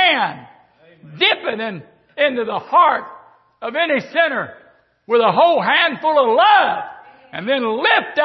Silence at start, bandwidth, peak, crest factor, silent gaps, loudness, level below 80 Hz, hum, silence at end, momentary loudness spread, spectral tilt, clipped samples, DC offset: 0 s; 6 kHz; -2 dBFS; 16 dB; none; -16 LUFS; -68 dBFS; none; 0 s; 16 LU; -6 dB/octave; under 0.1%; under 0.1%